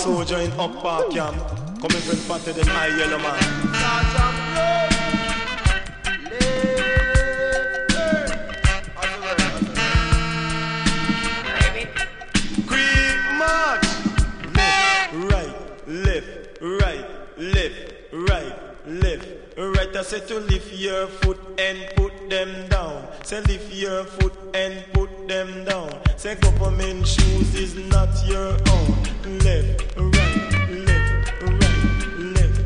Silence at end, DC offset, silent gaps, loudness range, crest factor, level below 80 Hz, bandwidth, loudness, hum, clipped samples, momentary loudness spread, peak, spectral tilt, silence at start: 0 s; under 0.1%; none; 5 LU; 18 dB; -24 dBFS; 10.5 kHz; -21 LUFS; none; under 0.1%; 8 LU; -2 dBFS; -4.5 dB/octave; 0 s